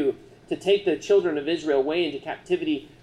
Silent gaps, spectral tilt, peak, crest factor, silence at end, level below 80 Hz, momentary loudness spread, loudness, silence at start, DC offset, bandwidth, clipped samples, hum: none; -5 dB/octave; -10 dBFS; 16 dB; 0.15 s; -60 dBFS; 9 LU; -25 LUFS; 0 s; under 0.1%; 10.5 kHz; under 0.1%; none